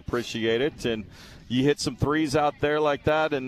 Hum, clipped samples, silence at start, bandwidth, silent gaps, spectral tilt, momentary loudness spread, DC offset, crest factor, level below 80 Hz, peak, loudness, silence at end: none; under 0.1%; 0.1 s; 14 kHz; none; -5.5 dB/octave; 7 LU; under 0.1%; 16 dB; -48 dBFS; -10 dBFS; -25 LUFS; 0 s